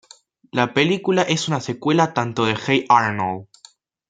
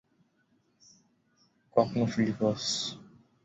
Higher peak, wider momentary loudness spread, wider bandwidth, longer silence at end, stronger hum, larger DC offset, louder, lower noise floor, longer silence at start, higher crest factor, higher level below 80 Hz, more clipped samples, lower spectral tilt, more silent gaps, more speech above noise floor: first, -2 dBFS vs -10 dBFS; about the same, 9 LU vs 7 LU; first, 9.4 kHz vs 8.4 kHz; first, 0.65 s vs 0.4 s; neither; neither; first, -19 LUFS vs -30 LUFS; second, -52 dBFS vs -71 dBFS; second, 0.55 s vs 1.75 s; about the same, 18 dB vs 22 dB; about the same, -62 dBFS vs -66 dBFS; neither; about the same, -5 dB/octave vs -5 dB/octave; neither; second, 32 dB vs 42 dB